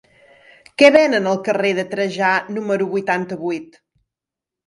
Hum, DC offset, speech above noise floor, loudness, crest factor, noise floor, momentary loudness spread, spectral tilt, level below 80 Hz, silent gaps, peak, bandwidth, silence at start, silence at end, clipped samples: none; under 0.1%; 69 dB; -17 LUFS; 18 dB; -87 dBFS; 14 LU; -5 dB/octave; -66 dBFS; none; 0 dBFS; 11.5 kHz; 0.8 s; 1.05 s; under 0.1%